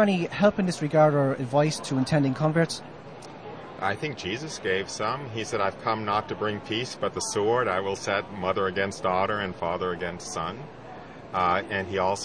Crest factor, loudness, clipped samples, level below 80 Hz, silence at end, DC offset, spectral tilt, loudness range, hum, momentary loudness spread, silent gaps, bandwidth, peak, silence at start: 18 dB; -26 LUFS; under 0.1%; -58 dBFS; 0 s; 0.2%; -5 dB/octave; 4 LU; none; 14 LU; none; 10.5 kHz; -8 dBFS; 0 s